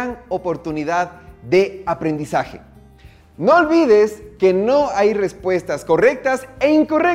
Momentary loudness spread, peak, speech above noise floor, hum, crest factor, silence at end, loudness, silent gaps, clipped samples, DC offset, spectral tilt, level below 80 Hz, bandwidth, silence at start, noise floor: 11 LU; -4 dBFS; 28 dB; none; 14 dB; 0 s; -17 LUFS; none; under 0.1%; under 0.1%; -6 dB/octave; -48 dBFS; 14.5 kHz; 0 s; -45 dBFS